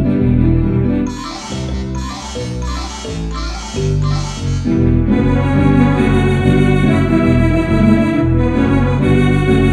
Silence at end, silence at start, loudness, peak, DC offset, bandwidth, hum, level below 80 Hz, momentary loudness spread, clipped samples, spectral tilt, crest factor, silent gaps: 0 s; 0 s; -14 LUFS; 0 dBFS; under 0.1%; 11.5 kHz; none; -22 dBFS; 11 LU; under 0.1%; -7.5 dB/octave; 14 dB; none